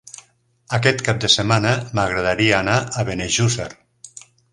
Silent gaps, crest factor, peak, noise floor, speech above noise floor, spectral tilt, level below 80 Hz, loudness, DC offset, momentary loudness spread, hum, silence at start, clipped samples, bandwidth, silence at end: none; 20 dB; -2 dBFS; -55 dBFS; 36 dB; -4 dB/octave; -46 dBFS; -18 LUFS; under 0.1%; 14 LU; none; 0.05 s; under 0.1%; 11.5 kHz; 0.3 s